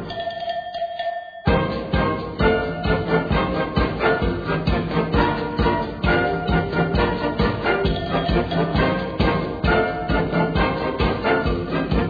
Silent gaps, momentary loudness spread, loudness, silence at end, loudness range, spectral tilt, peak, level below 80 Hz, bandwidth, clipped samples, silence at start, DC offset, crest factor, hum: none; 5 LU; -21 LUFS; 0 s; 1 LU; -8.5 dB/octave; -4 dBFS; -30 dBFS; 5 kHz; under 0.1%; 0 s; under 0.1%; 16 dB; none